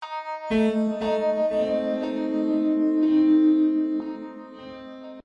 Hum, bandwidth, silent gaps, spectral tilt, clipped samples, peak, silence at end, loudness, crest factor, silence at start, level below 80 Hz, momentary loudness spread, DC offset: none; 7 kHz; none; -7.5 dB/octave; under 0.1%; -10 dBFS; 0.05 s; -23 LUFS; 12 dB; 0 s; -60 dBFS; 21 LU; under 0.1%